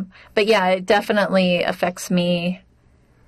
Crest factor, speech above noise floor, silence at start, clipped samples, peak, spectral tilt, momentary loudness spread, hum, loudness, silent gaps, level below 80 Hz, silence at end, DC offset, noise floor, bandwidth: 14 dB; 36 dB; 0 s; under 0.1%; -6 dBFS; -5 dB/octave; 7 LU; none; -19 LUFS; none; -56 dBFS; 0.7 s; under 0.1%; -55 dBFS; 14 kHz